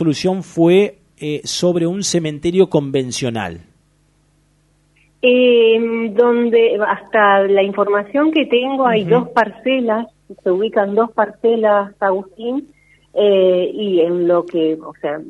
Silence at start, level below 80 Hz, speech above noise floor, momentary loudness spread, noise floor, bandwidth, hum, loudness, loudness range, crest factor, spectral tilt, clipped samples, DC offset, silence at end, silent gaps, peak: 0 s; -56 dBFS; 42 dB; 11 LU; -57 dBFS; 11.5 kHz; 50 Hz at -55 dBFS; -16 LUFS; 5 LU; 16 dB; -5 dB/octave; under 0.1%; under 0.1%; 0 s; none; 0 dBFS